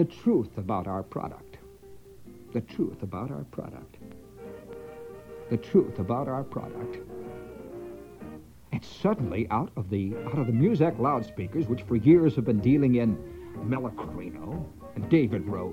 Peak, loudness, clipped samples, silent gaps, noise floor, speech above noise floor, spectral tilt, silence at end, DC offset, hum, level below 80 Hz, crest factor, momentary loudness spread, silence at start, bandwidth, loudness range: -8 dBFS; -28 LUFS; under 0.1%; none; -49 dBFS; 22 dB; -9.5 dB/octave; 0 s; under 0.1%; none; -54 dBFS; 20 dB; 21 LU; 0 s; 16 kHz; 13 LU